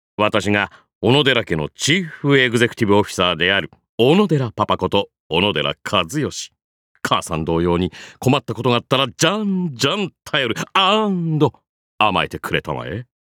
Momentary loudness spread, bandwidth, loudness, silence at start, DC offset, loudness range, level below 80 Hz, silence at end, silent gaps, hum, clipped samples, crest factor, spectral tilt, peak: 9 LU; 18 kHz; -18 LUFS; 0.2 s; under 0.1%; 4 LU; -48 dBFS; 0.3 s; 0.95-1.01 s, 3.89-3.98 s, 5.20-5.30 s, 6.64-6.95 s, 11.69-11.98 s; none; under 0.1%; 18 dB; -4.5 dB/octave; -2 dBFS